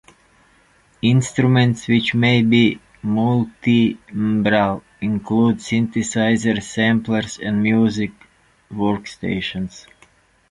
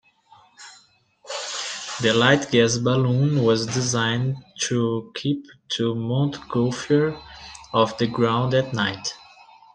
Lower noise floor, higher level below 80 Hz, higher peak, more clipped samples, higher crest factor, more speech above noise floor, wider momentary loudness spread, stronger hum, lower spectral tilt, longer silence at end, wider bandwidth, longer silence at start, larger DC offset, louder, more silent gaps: about the same, -55 dBFS vs -57 dBFS; first, -50 dBFS vs -58 dBFS; about the same, -2 dBFS vs -2 dBFS; neither; about the same, 16 dB vs 20 dB; about the same, 38 dB vs 35 dB; about the same, 10 LU vs 12 LU; neither; about the same, -6 dB/octave vs -5 dB/octave; first, 0.7 s vs 0.55 s; first, 11 kHz vs 9.8 kHz; first, 1.05 s vs 0.6 s; neither; first, -19 LUFS vs -22 LUFS; neither